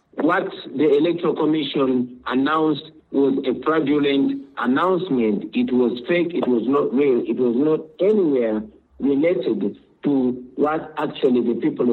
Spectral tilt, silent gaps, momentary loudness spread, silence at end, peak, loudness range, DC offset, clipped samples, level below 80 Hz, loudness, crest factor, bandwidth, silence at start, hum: -8.5 dB/octave; none; 6 LU; 0 s; -6 dBFS; 2 LU; under 0.1%; under 0.1%; -60 dBFS; -20 LUFS; 14 dB; 4.5 kHz; 0.15 s; none